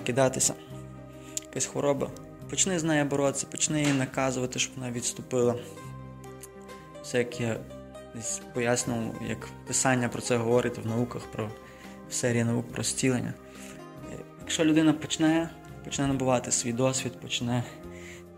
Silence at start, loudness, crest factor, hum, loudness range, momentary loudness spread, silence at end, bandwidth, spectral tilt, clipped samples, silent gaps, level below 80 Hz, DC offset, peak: 0 s; -28 LUFS; 22 dB; none; 5 LU; 19 LU; 0 s; 16 kHz; -4 dB/octave; under 0.1%; none; -56 dBFS; under 0.1%; -8 dBFS